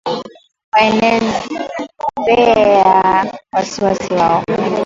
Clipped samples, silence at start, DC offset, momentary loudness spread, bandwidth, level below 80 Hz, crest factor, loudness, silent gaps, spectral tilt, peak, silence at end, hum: under 0.1%; 0.05 s; under 0.1%; 13 LU; 7.8 kHz; -46 dBFS; 14 dB; -14 LUFS; 0.64-0.72 s; -5 dB/octave; 0 dBFS; 0 s; none